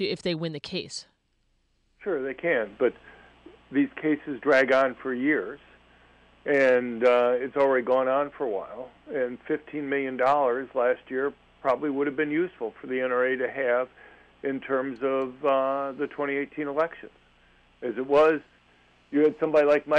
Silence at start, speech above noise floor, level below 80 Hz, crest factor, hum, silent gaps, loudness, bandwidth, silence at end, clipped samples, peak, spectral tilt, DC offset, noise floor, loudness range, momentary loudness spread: 0 s; 44 dB; -66 dBFS; 16 dB; 60 Hz at -60 dBFS; none; -26 LUFS; 9.6 kHz; 0 s; under 0.1%; -12 dBFS; -5.5 dB/octave; under 0.1%; -70 dBFS; 5 LU; 12 LU